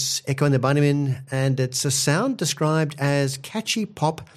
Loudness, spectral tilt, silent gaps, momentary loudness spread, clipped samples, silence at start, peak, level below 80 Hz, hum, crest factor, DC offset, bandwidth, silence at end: -22 LUFS; -4.5 dB/octave; none; 6 LU; under 0.1%; 0 s; -6 dBFS; -60 dBFS; none; 16 dB; under 0.1%; 15 kHz; 0.15 s